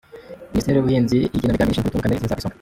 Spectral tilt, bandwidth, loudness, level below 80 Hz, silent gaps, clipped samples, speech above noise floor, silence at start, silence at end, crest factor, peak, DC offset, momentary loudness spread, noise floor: -7 dB/octave; 16.5 kHz; -20 LUFS; -36 dBFS; none; under 0.1%; 20 dB; 0.15 s; 0.1 s; 14 dB; -6 dBFS; under 0.1%; 8 LU; -39 dBFS